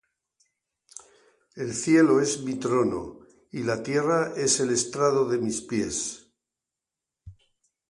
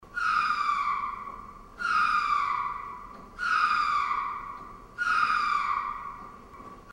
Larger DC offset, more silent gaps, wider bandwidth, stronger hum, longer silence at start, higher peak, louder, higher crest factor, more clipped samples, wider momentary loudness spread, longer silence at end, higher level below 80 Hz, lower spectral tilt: neither; neither; about the same, 11.5 kHz vs 12 kHz; neither; first, 1.55 s vs 0 s; first, -8 dBFS vs -12 dBFS; about the same, -25 LUFS vs -27 LUFS; about the same, 18 dB vs 16 dB; neither; about the same, 21 LU vs 20 LU; first, 0.6 s vs 0 s; about the same, -60 dBFS vs -56 dBFS; first, -4 dB/octave vs -2 dB/octave